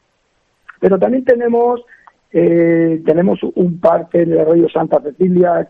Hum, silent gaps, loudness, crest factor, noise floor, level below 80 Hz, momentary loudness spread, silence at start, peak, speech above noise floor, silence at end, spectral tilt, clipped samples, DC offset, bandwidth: none; none; -13 LUFS; 14 dB; -62 dBFS; -54 dBFS; 5 LU; 0.8 s; 0 dBFS; 49 dB; 0.05 s; -10.5 dB/octave; under 0.1%; under 0.1%; 3.9 kHz